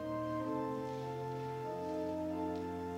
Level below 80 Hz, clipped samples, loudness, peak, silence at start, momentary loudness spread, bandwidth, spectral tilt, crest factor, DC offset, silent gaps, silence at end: -66 dBFS; under 0.1%; -40 LUFS; -26 dBFS; 0 s; 3 LU; 16 kHz; -7.5 dB/octave; 12 dB; under 0.1%; none; 0 s